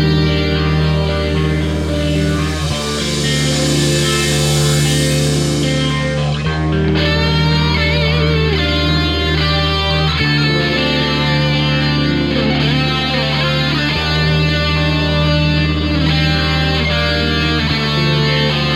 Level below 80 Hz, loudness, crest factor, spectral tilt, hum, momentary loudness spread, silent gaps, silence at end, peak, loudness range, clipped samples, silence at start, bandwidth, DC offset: -24 dBFS; -14 LUFS; 12 dB; -5 dB/octave; none; 3 LU; none; 0 s; -2 dBFS; 1 LU; under 0.1%; 0 s; 14 kHz; under 0.1%